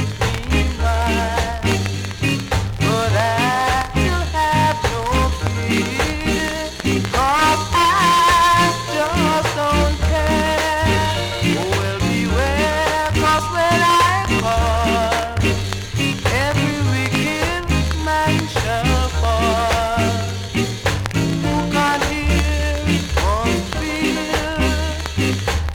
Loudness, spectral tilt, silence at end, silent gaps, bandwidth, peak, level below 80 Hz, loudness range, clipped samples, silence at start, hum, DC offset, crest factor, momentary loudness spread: -18 LUFS; -4.5 dB/octave; 0 s; none; 18.5 kHz; 0 dBFS; -26 dBFS; 3 LU; under 0.1%; 0 s; none; under 0.1%; 18 dB; 6 LU